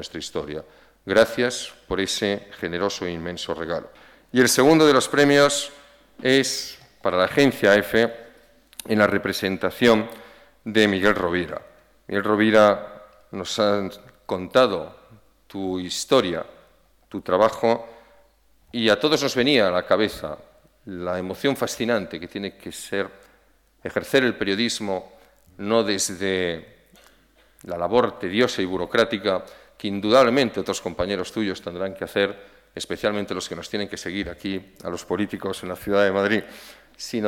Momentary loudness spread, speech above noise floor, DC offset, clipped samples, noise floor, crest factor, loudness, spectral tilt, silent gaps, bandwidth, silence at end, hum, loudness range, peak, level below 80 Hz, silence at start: 17 LU; 37 dB; under 0.1%; under 0.1%; -59 dBFS; 18 dB; -22 LUFS; -4 dB/octave; none; 18 kHz; 0 s; none; 7 LU; -6 dBFS; -54 dBFS; 0 s